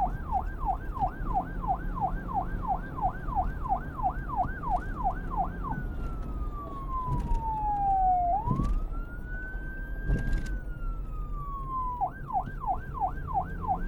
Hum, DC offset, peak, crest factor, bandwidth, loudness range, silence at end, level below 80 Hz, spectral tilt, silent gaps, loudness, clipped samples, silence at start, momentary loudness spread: none; under 0.1%; -14 dBFS; 16 dB; 6.4 kHz; 5 LU; 0 s; -34 dBFS; -8.5 dB/octave; none; -33 LUFS; under 0.1%; 0 s; 10 LU